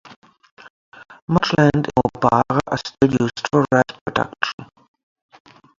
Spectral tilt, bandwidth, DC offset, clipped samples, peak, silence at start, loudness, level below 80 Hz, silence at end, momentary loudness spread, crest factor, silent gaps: -6.5 dB/octave; 7.6 kHz; under 0.1%; under 0.1%; 0 dBFS; 0.1 s; -19 LUFS; -48 dBFS; 1.15 s; 9 LU; 20 dB; 0.16-0.22 s, 0.51-0.57 s, 0.70-0.92 s, 1.22-1.28 s, 4.01-4.06 s, 4.53-4.58 s